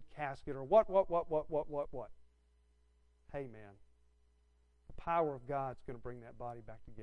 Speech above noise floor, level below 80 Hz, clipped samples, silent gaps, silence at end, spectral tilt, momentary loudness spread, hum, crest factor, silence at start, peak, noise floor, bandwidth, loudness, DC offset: 34 dB; -60 dBFS; under 0.1%; none; 0 s; -8 dB/octave; 19 LU; none; 22 dB; 0 s; -16 dBFS; -71 dBFS; 6.4 kHz; -37 LUFS; under 0.1%